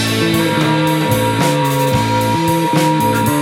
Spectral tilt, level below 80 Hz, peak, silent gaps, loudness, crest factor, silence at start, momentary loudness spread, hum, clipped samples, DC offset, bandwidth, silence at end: -5 dB/octave; -42 dBFS; -2 dBFS; none; -14 LUFS; 12 dB; 0 s; 1 LU; none; under 0.1%; under 0.1%; 17.5 kHz; 0 s